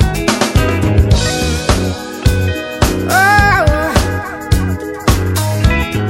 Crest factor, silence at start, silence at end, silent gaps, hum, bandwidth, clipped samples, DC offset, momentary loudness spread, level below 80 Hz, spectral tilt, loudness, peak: 12 dB; 0 s; 0 s; none; none; 16.5 kHz; under 0.1%; under 0.1%; 8 LU; -20 dBFS; -5 dB/octave; -13 LUFS; 0 dBFS